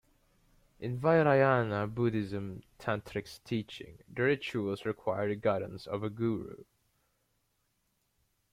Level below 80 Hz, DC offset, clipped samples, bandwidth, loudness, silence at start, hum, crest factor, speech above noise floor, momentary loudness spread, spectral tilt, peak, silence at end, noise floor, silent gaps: -64 dBFS; under 0.1%; under 0.1%; 15 kHz; -32 LUFS; 0.8 s; none; 20 dB; 46 dB; 15 LU; -7.5 dB/octave; -12 dBFS; 1.9 s; -77 dBFS; none